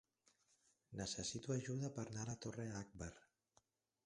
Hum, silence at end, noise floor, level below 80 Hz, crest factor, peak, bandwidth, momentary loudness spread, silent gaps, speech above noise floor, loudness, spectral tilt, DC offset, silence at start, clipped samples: none; 0.85 s; -80 dBFS; -70 dBFS; 20 dB; -30 dBFS; 11.5 kHz; 10 LU; none; 34 dB; -47 LUFS; -4.5 dB/octave; under 0.1%; 0.9 s; under 0.1%